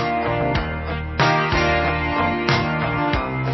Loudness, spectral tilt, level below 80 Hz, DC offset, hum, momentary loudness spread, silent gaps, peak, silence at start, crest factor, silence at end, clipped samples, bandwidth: -20 LUFS; -6 dB/octave; -32 dBFS; under 0.1%; none; 6 LU; none; -4 dBFS; 0 s; 16 dB; 0 s; under 0.1%; 6.2 kHz